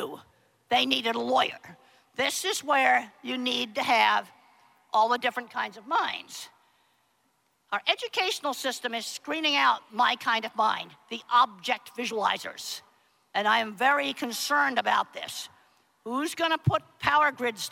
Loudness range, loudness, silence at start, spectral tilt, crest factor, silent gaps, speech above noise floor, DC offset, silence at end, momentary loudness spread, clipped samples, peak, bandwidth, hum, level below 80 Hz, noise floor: 5 LU; -26 LUFS; 0 s; -3 dB/octave; 22 dB; none; 44 dB; under 0.1%; 0 s; 13 LU; under 0.1%; -6 dBFS; 16.5 kHz; none; -68 dBFS; -71 dBFS